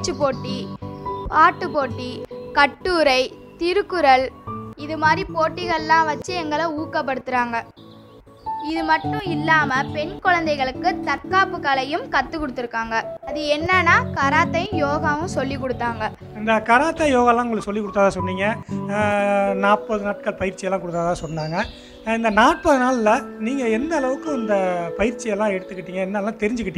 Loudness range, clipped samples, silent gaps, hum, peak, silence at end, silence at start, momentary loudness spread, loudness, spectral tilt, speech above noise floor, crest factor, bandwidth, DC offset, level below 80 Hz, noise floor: 3 LU; under 0.1%; none; none; 0 dBFS; 0 s; 0 s; 11 LU; -20 LUFS; -5 dB/octave; 25 dB; 20 dB; 12.5 kHz; under 0.1%; -46 dBFS; -45 dBFS